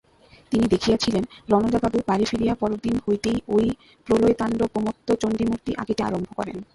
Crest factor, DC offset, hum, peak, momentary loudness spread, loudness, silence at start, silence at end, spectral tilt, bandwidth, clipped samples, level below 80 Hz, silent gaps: 18 dB; under 0.1%; none; -6 dBFS; 7 LU; -23 LUFS; 0.5 s; 0.1 s; -6 dB/octave; 11.5 kHz; under 0.1%; -46 dBFS; none